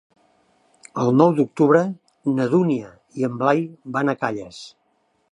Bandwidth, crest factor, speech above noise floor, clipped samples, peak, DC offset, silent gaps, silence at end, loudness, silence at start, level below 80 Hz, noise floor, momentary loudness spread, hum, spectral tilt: 11 kHz; 20 dB; 47 dB; under 0.1%; -2 dBFS; under 0.1%; none; 0.65 s; -20 LUFS; 0.95 s; -66 dBFS; -66 dBFS; 17 LU; none; -7.5 dB/octave